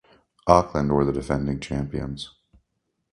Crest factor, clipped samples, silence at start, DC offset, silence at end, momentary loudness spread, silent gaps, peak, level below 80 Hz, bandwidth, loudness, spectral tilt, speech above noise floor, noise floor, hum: 24 dB; under 0.1%; 0.45 s; under 0.1%; 0.85 s; 14 LU; none; 0 dBFS; -40 dBFS; 11 kHz; -24 LUFS; -7 dB/octave; 54 dB; -77 dBFS; none